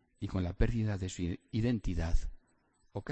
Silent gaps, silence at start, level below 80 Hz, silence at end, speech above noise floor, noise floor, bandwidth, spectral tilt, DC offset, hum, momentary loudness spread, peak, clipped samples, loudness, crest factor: none; 0.2 s; -38 dBFS; 0 s; 38 dB; -71 dBFS; 8.4 kHz; -7 dB/octave; under 0.1%; none; 10 LU; -16 dBFS; under 0.1%; -36 LUFS; 18 dB